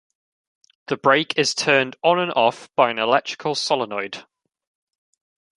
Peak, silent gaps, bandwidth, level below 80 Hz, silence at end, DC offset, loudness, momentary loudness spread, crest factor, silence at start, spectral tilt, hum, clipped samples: -2 dBFS; none; 11.5 kHz; -72 dBFS; 1.35 s; under 0.1%; -20 LUFS; 10 LU; 22 dB; 0.9 s; -3 dB/octave; none; under 0.1%